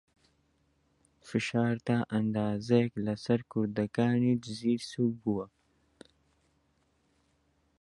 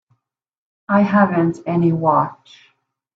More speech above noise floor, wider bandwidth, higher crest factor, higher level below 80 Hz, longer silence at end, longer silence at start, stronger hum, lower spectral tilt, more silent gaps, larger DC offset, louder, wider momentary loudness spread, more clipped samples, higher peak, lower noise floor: second, 43 dB vs 49 dB; first, 11.5 kHz vs 7.4 kHz; about the same, 20 dB vs 18 dB; second, -66 dBFS vs -60 dBFS; first, 2.35 s vs 0.8 s; first, 1.25 s vs 0.9 s; neither; second, -7 dB/octave vs -9 dB/octave; neither; neither; second, -31 LUFS vs -17 LUFS; about the same, 7 LU vs 5 LU; neither; second, -12 dBFS vs -2 dBFS; first, -72 dBFS vs -66 dBFS